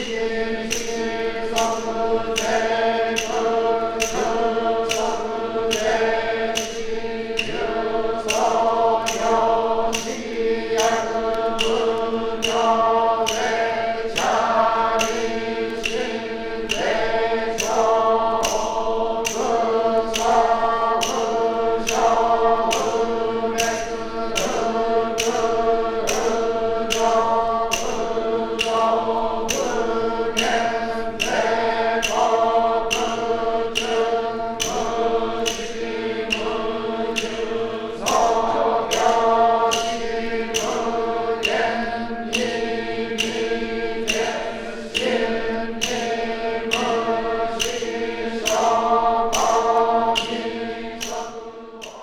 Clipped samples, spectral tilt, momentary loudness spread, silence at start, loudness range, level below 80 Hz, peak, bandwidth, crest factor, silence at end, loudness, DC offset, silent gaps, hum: under 0.1%; -2.5 dB/octave; 7 LU; 0 s; 3 LU; -42 dBFS; -6 dBFS; 19 kHz; 16 dB; 0 s; -21 LUFS; under 0.1%; none; none